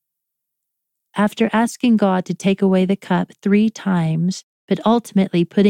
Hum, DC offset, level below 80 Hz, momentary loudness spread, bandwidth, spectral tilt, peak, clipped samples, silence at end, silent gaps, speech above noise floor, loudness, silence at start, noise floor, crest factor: none; under 0.1%; -62 dBFS; 5 LU; 13.5 kHz; -7 dB/octave; -2 dBFS; under 0.1%; 0 s; 4.43-4.68 s; 63 dB; -18 LUFS; 1.15 s; -79 dBFS; 16 dB